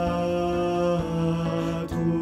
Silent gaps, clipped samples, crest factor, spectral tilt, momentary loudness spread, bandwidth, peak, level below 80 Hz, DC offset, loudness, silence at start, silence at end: none; under 0.1%; 12 dB; -7.5 dB/octave; 3 LU; 12.5 kHz; -12 dBFS; -44 dBFS; under 0.1%; -26 LUFS; 0 s; 0 s